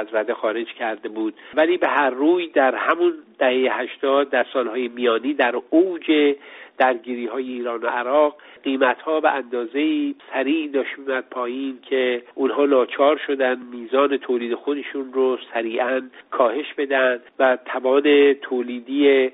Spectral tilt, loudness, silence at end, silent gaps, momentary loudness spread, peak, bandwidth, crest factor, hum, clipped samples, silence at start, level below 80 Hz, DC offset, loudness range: -0.5 dB/octave; -21 LUFS; 0.05 s; none; 9 LU; -4 dBFS; 4 kHz; 16 dB; none; under 0.1%; 0 s; -72 dBFS; under 0.1%; 3 LU